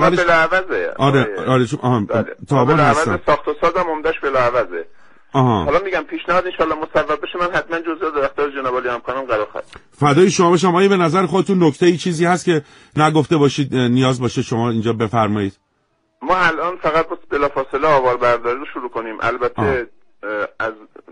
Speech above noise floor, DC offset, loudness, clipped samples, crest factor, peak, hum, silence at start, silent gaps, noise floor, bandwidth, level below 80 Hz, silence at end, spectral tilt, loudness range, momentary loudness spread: 48 dB; under 0.1%; -17 LUFS; under 0.1%; 16 dB; 0 dBFS; none; 0 s; none; -65 dBFS; 10.5 kHz; -44 dBFS; 0.3 s; -6 dB/octave; 4 LU; 10 LU